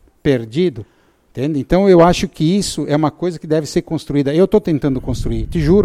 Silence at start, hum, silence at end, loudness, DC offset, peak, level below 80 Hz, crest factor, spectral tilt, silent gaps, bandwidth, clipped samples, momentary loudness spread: 0.25 s; none; 0 s; -16 LUFS; under 0.1%; 0 dBFS; -30 dBFS; 14 dB; -6.5 dB/octave; none; 14.5 kHz; under 0.1%; 11 LU